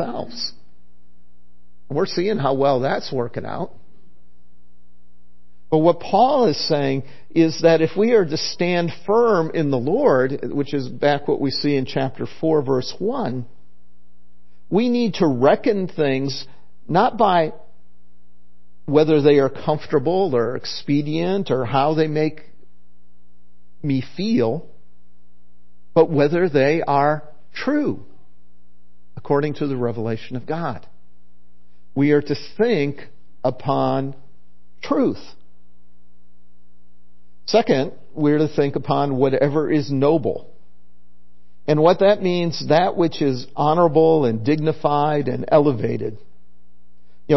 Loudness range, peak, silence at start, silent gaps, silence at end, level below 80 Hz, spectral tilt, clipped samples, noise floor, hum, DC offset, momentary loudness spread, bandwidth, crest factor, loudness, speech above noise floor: 7 LU; -2 dBFS; 0 s; none; 0 s; -58 dBFS; -7 dB/octave; under 0.1%; -60 dBFS; 60 Hz at -50 dBFS; 3%; 11 LU; 6.2 kHz; 18 dB; -20 LUFS; 41 dB